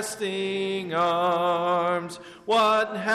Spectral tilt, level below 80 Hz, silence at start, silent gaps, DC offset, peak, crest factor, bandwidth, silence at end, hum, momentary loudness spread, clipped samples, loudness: -4 dB/octave; -68 dBFS; 0 s; none; under 0.1%; -14 dBFS; 10 dB; 13.5 kHz; 0 s; none; 8 LU; under 0.1%; -24 LUFS